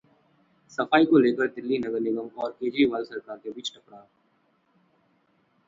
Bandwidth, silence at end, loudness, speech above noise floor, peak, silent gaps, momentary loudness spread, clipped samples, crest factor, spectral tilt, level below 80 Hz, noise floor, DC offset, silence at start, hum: 7.6 kHz; 1.7 s; -25 LUFS; 43 dB; -4 dBFS; none; 17 LU; under 0.1%; 22 dB; -5.5 dB/octave; -70 dBFS; -68 dBFS; under 0.1%; 0.8 s; none